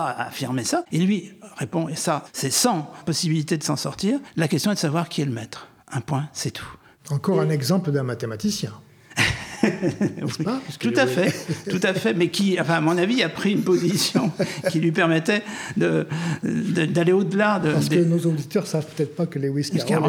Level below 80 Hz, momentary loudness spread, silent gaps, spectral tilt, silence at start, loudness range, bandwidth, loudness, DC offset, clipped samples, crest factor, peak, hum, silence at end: -56 dBFS; 9 LU; none; -5 dB/octave; 0 s; 4 LU; 18 kHz; -23 LUFS; under 0.1%; under 0.1%; 18 dB; -4 dBFS; none; 0 s